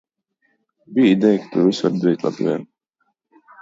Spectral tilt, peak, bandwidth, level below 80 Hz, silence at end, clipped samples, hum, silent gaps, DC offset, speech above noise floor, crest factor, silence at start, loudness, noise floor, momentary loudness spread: -7 dB/octave; -4 dBFS; 7.8 kHz; -68 dBFS; 1 s; under 0.1%; none; none; under 0.1%; 54 dB; 16 dB; 0.9 s; -18 LUFS; -71 dBFS; 9 LU